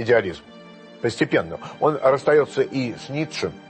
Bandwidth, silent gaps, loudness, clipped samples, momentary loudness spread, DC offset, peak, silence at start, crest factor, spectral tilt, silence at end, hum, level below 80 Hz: 8.8 kHz; none; -22 LUFS; under 0.1%; 10 LU; under 0.1%; -6 dBFS; 0 s; 16 dB; -6 dB/octave; 0.1 s; none; -58 dBFS